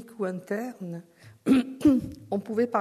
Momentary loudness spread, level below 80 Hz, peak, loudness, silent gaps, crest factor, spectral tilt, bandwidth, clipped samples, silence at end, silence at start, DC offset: 15 LU; -58 dBFS; -10 dBFS; -27 LUFS; none; 18 dB; -7 dB/octave; 13.5 kHz; under 0.1%; 0 s; 0 s; under 0.1%